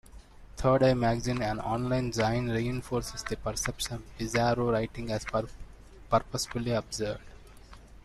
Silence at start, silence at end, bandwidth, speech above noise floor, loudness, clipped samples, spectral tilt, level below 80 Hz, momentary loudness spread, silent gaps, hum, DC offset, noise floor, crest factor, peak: 0.15 s; 0.1 s; 13.5 kHz; 21 dB; -30 LUFS; under 0.1%; -5 dB/octave; -46 dBFS; 10 LU; none; none; under 0.1%; -50 dBFS; 20 dB; -10 dBFS